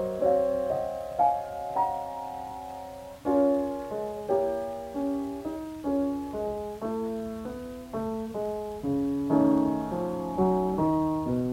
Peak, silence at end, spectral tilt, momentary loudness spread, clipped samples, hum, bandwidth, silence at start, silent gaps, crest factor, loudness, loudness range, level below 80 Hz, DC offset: -12 dBFS; 0 s; -8 dB/octave; 12 LU; under 0.1%; none; 16 kHz; 0 s; none; 16 dB; -29 LUFS; 5 LU; -52 dBFS; under 0.1%